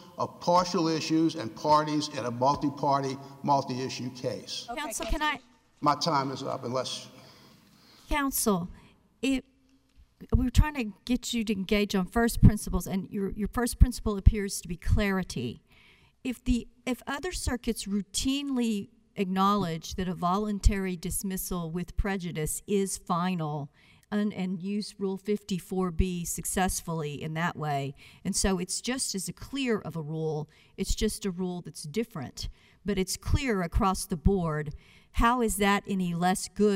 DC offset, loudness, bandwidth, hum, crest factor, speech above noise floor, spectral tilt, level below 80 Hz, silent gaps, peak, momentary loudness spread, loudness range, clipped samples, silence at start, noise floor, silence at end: under 0.1%; -29 LUFS; 16 kHz; none; 24 dB; 35 dB; -5 dB/octave; -36 dBFS; none; -6 dBFS; 10 LU; 5 LU; under 0.1%; 0 s; -63 dBFS; 0 s